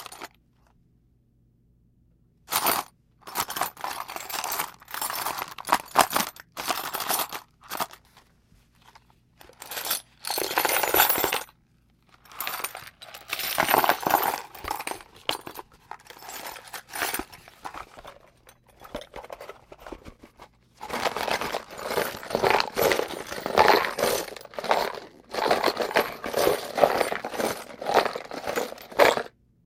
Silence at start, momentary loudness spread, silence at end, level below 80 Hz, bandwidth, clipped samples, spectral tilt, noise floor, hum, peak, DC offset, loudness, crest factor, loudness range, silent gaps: 0 s; 21 LU; 0.4 s; -58 dBFS; 17 kHz; under 0.1%; -2 dB/octave; -63 dBFS; none; 0 dBFS; under 0.1%; -26 LUFS; 28 dB; 12 LU; none